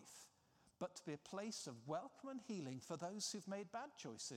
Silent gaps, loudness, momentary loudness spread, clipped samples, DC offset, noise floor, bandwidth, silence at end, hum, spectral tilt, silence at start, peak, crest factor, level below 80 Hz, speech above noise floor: none; -50 LUFS; 8 LU; under 0.1%; under 0.1%; -76 dBFS; 16 kHz; 0 s; none; -4 dB/octave; 0 s; -32 dBFS; 18 dB; under -90 dBFS; 26 dB